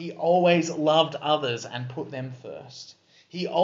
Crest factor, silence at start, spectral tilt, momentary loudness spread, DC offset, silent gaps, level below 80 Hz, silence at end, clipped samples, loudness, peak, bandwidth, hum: 18 dB; 0 s; -3.5 dB/octave; 19 LU; under 0.1%; none; -76 dBFS; 0 s; under 0.1%; -24 LUFS; -6 dBFS; 7.8 kHz; none